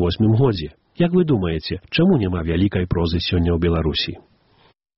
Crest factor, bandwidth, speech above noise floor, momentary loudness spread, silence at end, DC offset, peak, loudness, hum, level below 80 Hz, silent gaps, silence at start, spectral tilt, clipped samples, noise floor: 14 dB; 5.8 kHz; 38 dB; 7 LU; 0.8 s; under 0.1%; -6 dBFS; -20 LUFS; none; -34 dBFS; none; 0 s; -6 dB/octave; under 0.1%; -57 dBFS